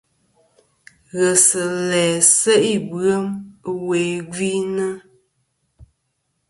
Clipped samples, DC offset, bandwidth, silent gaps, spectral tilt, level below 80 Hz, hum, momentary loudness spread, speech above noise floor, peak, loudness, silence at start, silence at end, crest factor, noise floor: under 0.1%; under 0.1%; 12 kHz; none; -3 dB/octave; -60 dBFS; none; 15 LU; 53 dB; 0 dBFS; -17 LUFS; 1.15 s; 0.65 s; 20 dB; -71 dBFS